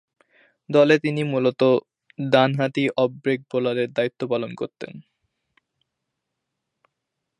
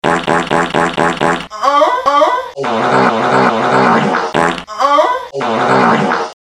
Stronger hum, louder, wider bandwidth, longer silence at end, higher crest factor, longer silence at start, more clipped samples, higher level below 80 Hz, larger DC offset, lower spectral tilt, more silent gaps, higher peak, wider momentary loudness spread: neither; second, -22 LUFS vs -12 LUFS; second, 10.5 kHz vs 13 kHz; first, 2.4 s vs 0.15 s; first, 22 dB vs 12 dB; first, 0.7 s vs 0.05 s; neither; second, -72 dBFS vs -48 dBFS; neither; first, -7 dB/octave vs -5 dB/octave; neither; about the same, -2 dBFS vs 0 dBFS; first, 14 LU vs 5 LU